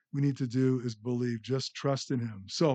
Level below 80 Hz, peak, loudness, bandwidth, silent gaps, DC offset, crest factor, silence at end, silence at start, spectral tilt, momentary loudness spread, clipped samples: -76 dBFS; -14 dBFS; -32 LUFS; 8.6 kHz; none; under 0.1%; 16 dB; 0 s; 0.15 s; -6.5 dB/octave; 5 LU; under 0.1%